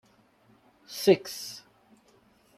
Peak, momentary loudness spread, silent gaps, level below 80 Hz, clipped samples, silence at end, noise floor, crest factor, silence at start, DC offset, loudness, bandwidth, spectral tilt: -8 dBFS; 19 LU; none; -76 dBFS; under 0.1%; 1 s; -63 dBFS; 24 dB; 0.9 s; under 0.1%; -27 LUFS; 15.5 kHz; -4.5 dB/octave